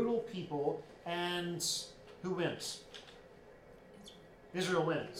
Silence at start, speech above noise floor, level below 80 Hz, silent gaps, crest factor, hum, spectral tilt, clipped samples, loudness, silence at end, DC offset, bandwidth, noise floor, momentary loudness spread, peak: 0 s; 20 dB; -68 dBFS; none; 18 dB; none; -4 dB/octave; under 0.1%; -38 LUFS; 0 s; under 0.1%; 16 kHz; -57 dBFS; 23 LU; -22 dBFS